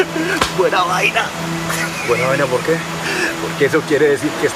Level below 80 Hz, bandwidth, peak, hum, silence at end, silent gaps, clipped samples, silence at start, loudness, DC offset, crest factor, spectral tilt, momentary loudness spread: -46 dBFS; 15.5 kHz; 0 dBFS; none; 0 s; none; under 0.1%; 0 s; -16 LUFS; under 0.1%; 16 dB; -4 dB/octave; 5 LU